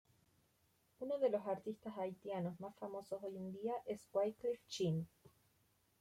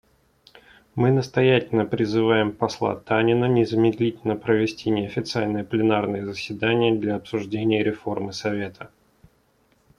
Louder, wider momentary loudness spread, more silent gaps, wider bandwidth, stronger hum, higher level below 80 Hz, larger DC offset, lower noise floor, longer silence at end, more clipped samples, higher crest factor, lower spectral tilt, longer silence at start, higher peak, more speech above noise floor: second, -43 LUFS vs -23 LUFS; about the same, 10 LU vs 9 LU; neither; first, 16 kHz vs 11 kHz; neither; second, -82 dBFS vs -58 dBFS; neither; first, -78 dBFS vs -63 dBFS; second, 0.75 s vs 1.1 s; neither; about the same, 18 dB vs 18 dB; about the same, -6.5 dB/octave vs -7 dB/octave; about the same, 1 s vs 0.95 s; second, -26 dBFS vs -4 dBFS; second, 35 dB vs 41 dB